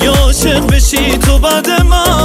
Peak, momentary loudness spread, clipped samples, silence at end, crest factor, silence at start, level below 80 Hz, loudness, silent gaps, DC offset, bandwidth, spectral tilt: 0 dBFS; 1 LU; under 0.1%; 0 s; 8 dB; 0 s; -12 dBFS; -10 LUFS; none; under 0.1%; 16 kHz; -4 dB/octave